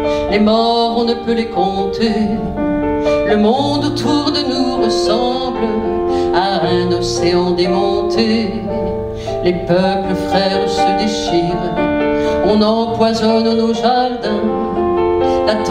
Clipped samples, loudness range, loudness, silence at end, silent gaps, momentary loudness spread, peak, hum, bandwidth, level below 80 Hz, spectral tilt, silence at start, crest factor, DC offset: under 0.1%; 1 LU; -15 LUFS; 0 s; none; 5 LU; 0 dBFS; none; 11.5 kHz; -36 dBFS; -5.5 dB/octave; 0 s; 14 dB; under 0.1%